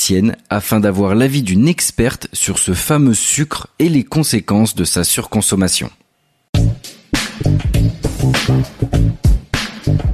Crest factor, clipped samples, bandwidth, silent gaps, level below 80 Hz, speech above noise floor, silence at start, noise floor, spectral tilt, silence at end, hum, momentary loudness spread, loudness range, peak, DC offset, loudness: 12 dB; under 0.1%; 14.5 kHz; 6.49-6.53 s; -24 dBFS; 45 dB; 0 s; -59 dBFS; -4.5 dB/octave; 0 s; none; 6 LU; 3 LU; -2 dBFS; under 0.1%; -15 LUFS